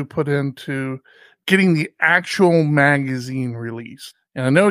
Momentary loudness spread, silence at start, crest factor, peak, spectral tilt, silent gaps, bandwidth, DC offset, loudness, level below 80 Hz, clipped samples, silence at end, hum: 17 LU; 0 s; 18 dB; -2 dBFS; -6.5 dB/octave; none; 15.5 kHz; under 0.1%; -18 LUFS; -62 dBFS; under 0.1%; 0 s; none